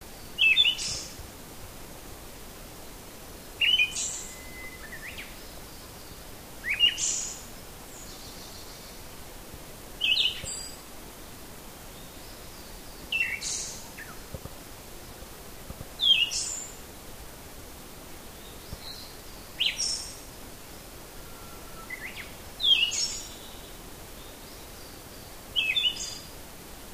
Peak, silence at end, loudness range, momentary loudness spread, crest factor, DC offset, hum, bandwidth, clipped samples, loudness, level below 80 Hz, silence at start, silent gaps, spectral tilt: -10 dBFS; 0 s; 6 LU; 22 LU; 22 dB; under 0.1%; none; 15.5 kHz; under 0.1%; -26 LUFS; -50 dBFS; 0 s; none; 0 dB/octave